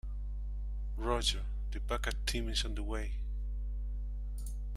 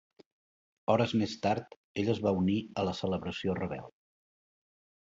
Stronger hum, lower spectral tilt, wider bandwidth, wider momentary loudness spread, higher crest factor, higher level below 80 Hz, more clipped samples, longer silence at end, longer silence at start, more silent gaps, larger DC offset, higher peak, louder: first, 50 Hz at -35 dBFS vs none; second, -4 dB/octave vs -6.5 dB/octave; first, 13 kHz vs 7.8 kHz; about the same, 10 LU vs 10 LU; about the same, 20 dB vs 20 dB; first, -36 dBFS vs -58 dBFS; neither; second, 0 s vs 1.15 s; second, 0.05 s vs 0.9 s; second, none vs 1.77-1.95 s; neither; second, -16 dBFS vs -12 dBFS; second, -38 LUFS vs -32 LUFS